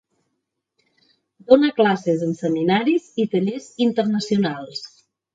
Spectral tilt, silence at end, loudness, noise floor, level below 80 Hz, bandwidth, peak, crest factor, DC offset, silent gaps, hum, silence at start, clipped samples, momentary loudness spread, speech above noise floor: -6.5 dB/octave; 0.45 s; -20 LUFS; -77 dBFS; -64 dBFS; 9 kHz; 0 dBFS; 20 dB; under 0.1%; none; none; 1.5 s; under 0.1%; 12 LU; 58 dB